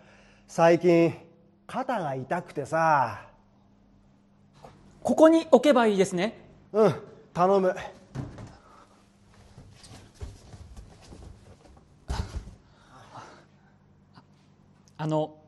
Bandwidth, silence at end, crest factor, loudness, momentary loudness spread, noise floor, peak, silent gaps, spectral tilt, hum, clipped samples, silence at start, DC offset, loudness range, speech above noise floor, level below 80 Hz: 12 kHz; 0.2 s; 24 dB; -24 LUFS; 25 LU; -60 dBFS; -4 dBFS; none; -6.5 dB/octave; none; under 0.1%; 0.5 s; under 0.1%; 20 LU; 37 dB; -50 dBFS